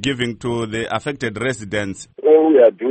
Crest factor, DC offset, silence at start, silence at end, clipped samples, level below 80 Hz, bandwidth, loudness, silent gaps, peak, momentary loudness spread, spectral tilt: 16 dB; under 0.1%; 0 s; 0 s; under 0.1%; -50 dBFS; 8.8 kHz; -17 LUFS; none; -2 dBFS; 12 LU; -5.5 dB/octave